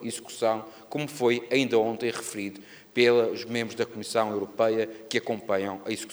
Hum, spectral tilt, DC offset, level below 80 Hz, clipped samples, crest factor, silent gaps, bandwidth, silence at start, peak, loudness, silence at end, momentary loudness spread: none; -4 dB/octave; under 0.1%; -76 dBFS; under 0.1%; 20 dB; none; over 20 kHz; 0 s; -8 dBFS; -27 LUFS; 0 s; 11 LU